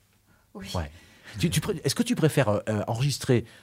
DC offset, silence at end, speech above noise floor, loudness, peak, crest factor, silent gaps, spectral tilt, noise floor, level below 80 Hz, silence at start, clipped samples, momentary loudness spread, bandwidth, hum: under 0.1%; 0.15 s; 36 dB; -26 LUFS; -8 dBFS; 20 dB; none; -5.5 dB/octave; -63 dBFS; -50 dBFS; 0.55 s; under 0.1%; 13 LU; 16 kHz; none